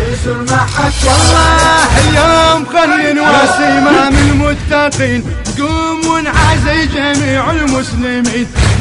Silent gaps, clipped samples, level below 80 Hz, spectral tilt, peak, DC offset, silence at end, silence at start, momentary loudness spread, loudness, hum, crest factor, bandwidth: none; under 0.1%; -20 dBFS; -4.5 dB/octave; 0 dBFS; under 0.1%; 0 s; 0 s; 7 LU; -10 LUFS; none; 10 dB; 11.5 kHz